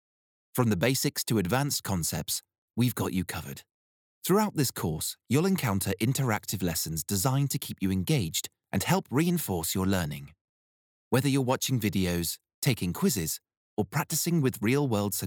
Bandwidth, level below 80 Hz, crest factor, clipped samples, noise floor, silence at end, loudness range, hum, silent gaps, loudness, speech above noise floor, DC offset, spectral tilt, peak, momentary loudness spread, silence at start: over 20 kHz; -60 dBFS; 18 dB; under 0.1%; under -90 dBFS; 0 s; 2 LU; none; 2.58-2.68 s, 3.71-4.22 s, 10.41-11.11 s, 12.54-12.62 s, 13.57-13.77 s; -28 LUFS; over 62 dB; under 0.1%; -4.5 dB/octave; -10 dBFS; 8 LU; 0.55 s